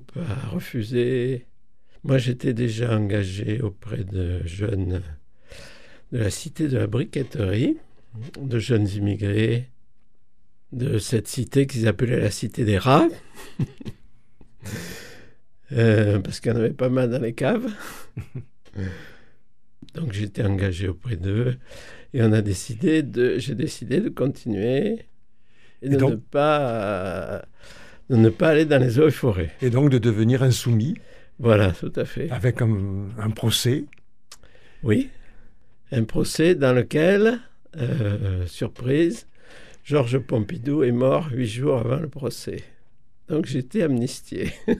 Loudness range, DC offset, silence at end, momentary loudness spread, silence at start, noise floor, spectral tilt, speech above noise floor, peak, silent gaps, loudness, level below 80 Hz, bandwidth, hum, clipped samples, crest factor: 7 LU; 0.7%; 0 s; 15 LU; 0.15 s; -65 dBFS; -6.5 dB/octave; 43 dB; -2 dBFS; none; -23 LUFS; -48 dBFS; 14.5 kHz; none; under 0.1%; 20 dB